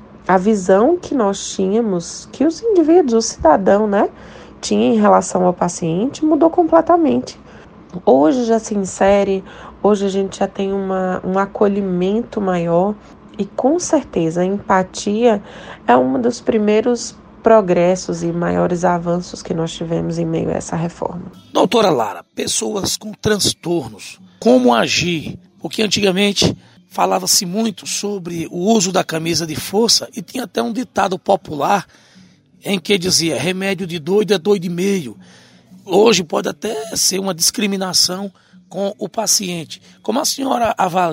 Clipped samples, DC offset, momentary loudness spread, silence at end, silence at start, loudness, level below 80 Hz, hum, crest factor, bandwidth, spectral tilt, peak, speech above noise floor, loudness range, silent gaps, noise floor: under 0.1%; under 0.1%; 11 LU; 0 s; 0 s; -16 LUFS; -48 dBFS; none; 16 dB; 16 kHz; -4 dB/octave; 0 dBFS; 31 dB; 3 LU; none; -47 dBFS